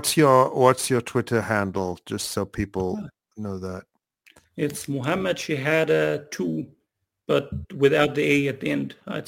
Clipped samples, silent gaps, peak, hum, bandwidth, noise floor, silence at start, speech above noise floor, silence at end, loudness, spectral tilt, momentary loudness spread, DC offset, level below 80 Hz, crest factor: under 0.1%; none; -2 dBFS; none; 17 kHz; -76 dBFS; 0 s; 53 dB; 0 s; -23 LUFS; -5 dB/octave; 15 LU; under 0.1%; -52 dBFS; 22 dB